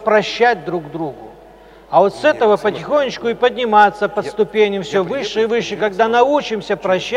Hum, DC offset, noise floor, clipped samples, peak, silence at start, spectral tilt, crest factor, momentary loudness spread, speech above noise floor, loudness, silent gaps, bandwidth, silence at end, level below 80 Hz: none; under 0.1%; -42 dBFS; under 0.1%; 0 dBFS; 0 s; -5 dB/octave; 16 dB; 9 LU; 26 dB; -16 LUFS; none; 11 kHz; 0 s; -52 dBFS